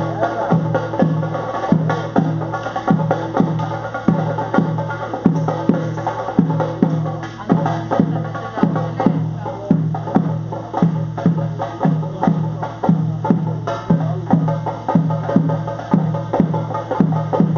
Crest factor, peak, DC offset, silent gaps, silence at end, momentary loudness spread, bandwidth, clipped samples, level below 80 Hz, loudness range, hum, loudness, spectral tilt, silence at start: 18 dB; 0 dBFS; under 0.1%; none; 0 s; 5 LU; 6.8 kHz; under 0.1%; -50 dBFS; 1 LU; none; -19 LUFS; -8.5 dB/octave; 0 s